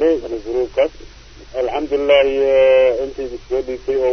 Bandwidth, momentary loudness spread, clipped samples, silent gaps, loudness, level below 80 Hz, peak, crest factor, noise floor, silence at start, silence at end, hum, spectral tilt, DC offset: 6.4 kHz; 11 LU; under 0.1%; none; -17 LUFS; -42 dBFS; -2 dBFS; 14 dB; -39 dBFS; 0 s; 0 s; none; -5 dB/octave; under 0.1%